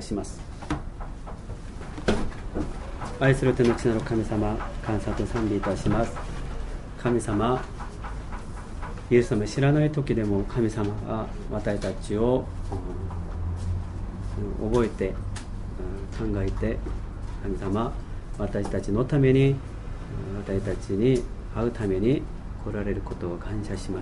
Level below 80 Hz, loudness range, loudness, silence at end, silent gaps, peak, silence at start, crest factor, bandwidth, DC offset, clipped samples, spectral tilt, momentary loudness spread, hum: -36 dBFS; 5 LU; -28 LUFS; 0 s; none; -6 dBFS; 0 s; 20 dB; 11.5 kHz; under 0.1%; under 0.1%; -7.5 dB/octave; 15 LU; none